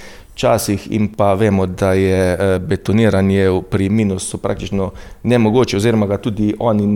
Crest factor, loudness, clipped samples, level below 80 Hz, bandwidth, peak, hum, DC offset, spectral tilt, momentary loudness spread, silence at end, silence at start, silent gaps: 14 dB; -16 LUFS; under 0.1%; -40 dBFS; 18 kHz; -2 dBFS; none; under 0.1%; -6.5 dB/octave; 8 LU; 0 s; 0 s; none